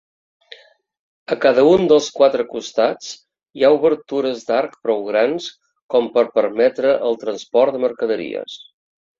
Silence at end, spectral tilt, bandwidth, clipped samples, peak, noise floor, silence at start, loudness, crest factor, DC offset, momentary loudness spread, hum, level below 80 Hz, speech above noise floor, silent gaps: 0.65 s; -4.5 dB/octave; 7.6 kHz; under 0.1%; -2 dBFS; -45 dBFS; 1.3 s; -17 LUFS; 16 dB; under 0.1%; 14 LU; none; -60 dBFS; 28 dB; 5.82-5.89 s